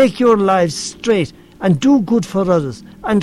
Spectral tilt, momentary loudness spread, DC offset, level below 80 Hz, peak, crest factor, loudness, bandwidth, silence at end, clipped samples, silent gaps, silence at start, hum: -6 dB/octave; 10 LU; under 0.1%; -48 dBFS; -2 dBFS; 12 dB; -15 LUFS; 12.5 kHz; 0 s; under 0.1%; none; 0 s; none